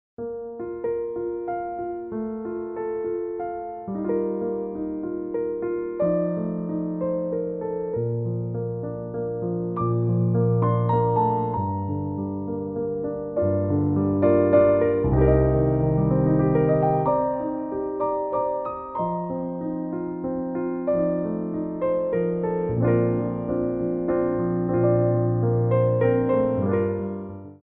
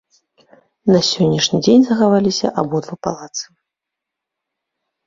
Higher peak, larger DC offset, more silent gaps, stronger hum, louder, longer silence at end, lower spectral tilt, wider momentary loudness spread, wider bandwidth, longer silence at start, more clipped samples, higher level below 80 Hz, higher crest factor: second, -8 dBFS vs -2 dBFS; neither; neither; neither; second, -24 LUFS vs -16 LUFS; second, 0.1 s vs 1.65 s; first, -11 dB/octave vs -5 dB/octave; second, 10 LU vs 14 LU; second, 3.8 kHz vs 7.8 kHz; second, 0.2 s vs 0.85 s; neither; first, -42 dBFS vs -54 dBFS; about the same, 16 dB vs 16 dB